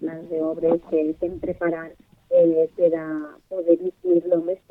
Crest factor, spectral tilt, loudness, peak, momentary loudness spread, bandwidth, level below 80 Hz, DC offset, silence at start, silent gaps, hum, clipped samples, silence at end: 16 dB; -10 dB/octave; -23 LUFS; -6 dBFS; 12 LU; 3.7 kHz; -56 dBFS; under 0.1%; 0 s; none; none; under 0.1%; 0.15 s